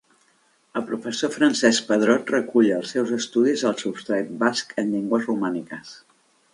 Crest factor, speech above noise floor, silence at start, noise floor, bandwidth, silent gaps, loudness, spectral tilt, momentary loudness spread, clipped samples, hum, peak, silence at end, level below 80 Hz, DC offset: 20 dB; 40 dB; 0.75 s; -62 dBFS; 11.5 kHz; none; -22 LUFS; -4 dB/octave; 11 LU; under 0.1%; none; -2 dBFS; 0.55 s; -70 dBFS; under 0.1%